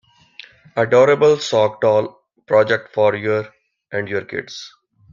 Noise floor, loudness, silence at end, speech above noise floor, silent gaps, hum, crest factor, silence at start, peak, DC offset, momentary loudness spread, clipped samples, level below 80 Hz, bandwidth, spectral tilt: -44 dBFS; -17 LUFS; 0.45 s; 27 dB; none; none; 16 dB; 0.75 s; -2 dBFS; under 0.1%; 18 LU; under 0.1%; -62 dBFS; 7.6 kHz; -5 dB/octave